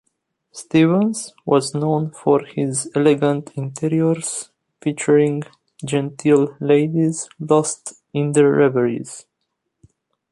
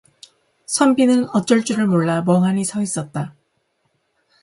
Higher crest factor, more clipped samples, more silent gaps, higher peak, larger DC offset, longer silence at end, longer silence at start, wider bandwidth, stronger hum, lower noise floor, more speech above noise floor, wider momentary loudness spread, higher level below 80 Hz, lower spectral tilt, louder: about the same, 16 dB vs 18 dB; neither; neither; about the same, -2 dBFS vs -2 dBFS; neither; about the same, 1.1 s vs 1.1 s; second, 0.55 s vs 0.7 s; about the same, 11.5 kHz vs 11.5 kHz; neither; first, -76 dBFS vs -68 dBFS; first, 58 dB vs 51 dB; first, 13 LU vs 10 LU; about the same, -62 dBFS vs -62 dBFS; about the same, -6 dB/octave vs -5.5 dB/octave; about the same, -19 LUFS vs -18 LUFS